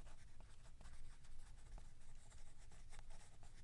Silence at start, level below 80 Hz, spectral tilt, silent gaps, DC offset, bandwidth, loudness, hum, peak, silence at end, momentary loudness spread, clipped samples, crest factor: 0 s; -56 dBFS; -4 dB/octave; none; under 0.1%; 11 kHz; -65 LUFS; none; -42 dBFS; 0 s; 3 LU; under 0.1%; 10 dB